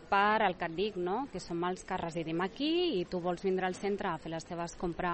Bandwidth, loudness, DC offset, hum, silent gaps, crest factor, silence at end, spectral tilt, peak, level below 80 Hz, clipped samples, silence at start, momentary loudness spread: 8.4 kHz; -34 LUFS; under 0.1%; none; none; 18 dB; 0 s; -5.5 dB/octave; -16 dBFS; -58 dBFS; under 0.1%; 0 s; 9 LU